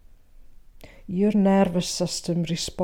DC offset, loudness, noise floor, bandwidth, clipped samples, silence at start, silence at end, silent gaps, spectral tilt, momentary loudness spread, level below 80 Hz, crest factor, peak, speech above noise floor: under 0.1%; -23 LUFS; -47 dBFS; 16.5 kHz; under 0.1%; 0.4 s; 0 s; none; -5.5 dB/octave; 8 LU; -48 dBFS; 14 dB; -10 dBFS; 25 dB